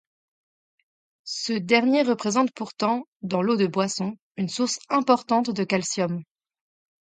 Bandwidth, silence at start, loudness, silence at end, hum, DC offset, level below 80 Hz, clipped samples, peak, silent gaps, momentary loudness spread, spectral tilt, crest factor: 9.4 kHz; 1.25 s; -24 LUFS; 0.8 s; none; under 0.1%; -72 dBFS; under 0.1%; -6 dBFS; 3.08-3.20 s, 4.21-4.31 s; 9 LU; -4.5 dB/octave; 20 dB